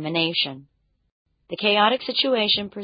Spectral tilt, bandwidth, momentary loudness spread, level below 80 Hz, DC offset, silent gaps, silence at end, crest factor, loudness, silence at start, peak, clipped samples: -8.5 dB/octave; 5.2 kHz; 7 LU; -66 dBFS; under 0.1%; 1.12-1.26 s; 0 s; 20 dB; -21 LUFS; 0 s; -4 dBFS; under 0.1%